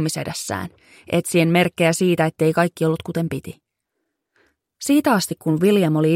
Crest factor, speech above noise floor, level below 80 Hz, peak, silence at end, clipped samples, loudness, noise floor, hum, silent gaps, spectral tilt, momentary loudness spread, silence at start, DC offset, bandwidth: 16 dB; 58 dB; -58 dBFS; -4 dBFS; 0 s; under 0.1%; -19 LUFS; -77 dBFS; none; none; -5.5 dB/octave; 11 LU; 0 s; under 0.1%; 16.5 kHz